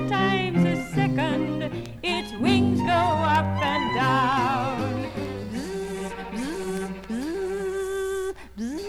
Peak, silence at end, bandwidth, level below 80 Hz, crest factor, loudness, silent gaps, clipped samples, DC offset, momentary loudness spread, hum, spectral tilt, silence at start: -8 dBFS; 0 s; 15.5 kHz; -48 dBFS; 16 dB; -25 LUFS; none; under 0.1%; under 0.1%; 10 LU; none; -6 dB/octave; 0 s